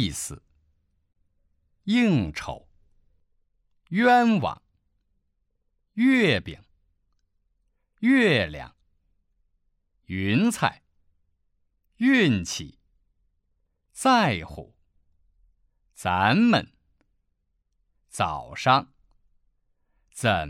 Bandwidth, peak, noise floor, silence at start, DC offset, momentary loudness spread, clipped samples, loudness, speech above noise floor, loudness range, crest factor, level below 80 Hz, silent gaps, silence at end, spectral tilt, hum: 14.5 kHz; -6 dBFS; -74 dBFS; 0 s; under 0.1%; 19 LU; under 0.1%; -23 LUFS; 51 dB; 5 LU; 22 dB; -54 dBFS; none; 0 s; -5 dB/octave; none